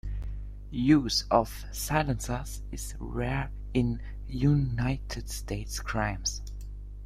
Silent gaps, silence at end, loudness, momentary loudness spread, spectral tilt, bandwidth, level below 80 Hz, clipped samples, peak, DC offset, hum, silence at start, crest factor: none; 0 s; -30 LUFS; 15 LU; -5 dB/octave; 16 kHz; -38 dBFS; under 0.1%; -8 dBFS; under 0.1%; 50 Hz at -40 dBFS; 0.05 s; 22 dB